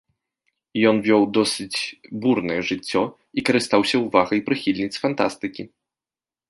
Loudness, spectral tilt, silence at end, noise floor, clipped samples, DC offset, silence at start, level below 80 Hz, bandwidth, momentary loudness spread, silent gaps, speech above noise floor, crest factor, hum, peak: -21 LUFS; -4.5 dB/octave; 0.85 s; under -90 dBFS; under 0.1%; under 0.1%; 0.75 s; -60 dBFS; 11.5 kHz; 11 LU; none; over 69 dB; 20 dB; none; -2 dBFS